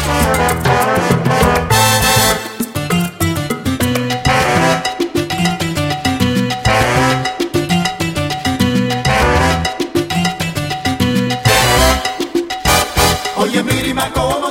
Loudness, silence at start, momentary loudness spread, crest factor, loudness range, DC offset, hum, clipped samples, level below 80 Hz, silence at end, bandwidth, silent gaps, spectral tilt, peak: -14 LUFS; 0 s; 7 LU; 14 dB; 2 LU; under 0.1%; none; under 0.1%; -28 dBFS; 0 s; 16.5 kHz; none; -4 dB/octave; 0 dBFS